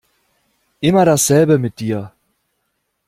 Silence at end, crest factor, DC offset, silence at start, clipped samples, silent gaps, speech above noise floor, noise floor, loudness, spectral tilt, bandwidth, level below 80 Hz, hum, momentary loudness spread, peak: 1 s; 16 dB; under 0.1%; 0.8 s; under 0.1%; none; 57 dB; -70 dBFS; -15 LUFS; -5 dB/octave; 16 kHz; -52 dBFS; none; 12 LU; -2 dBFS